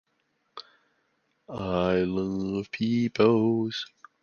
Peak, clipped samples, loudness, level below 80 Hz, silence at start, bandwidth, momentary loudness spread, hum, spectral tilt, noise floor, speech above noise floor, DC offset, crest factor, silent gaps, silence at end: -8 dBFS; under 0.1%; -26 LUFS; -56 dBFS; 0.55 s; 7 kHz; 23 LU; none; -7 dB/octave; -74 dBFS; 48 dB; under 0.1%; 20 dB; none; 0.4 s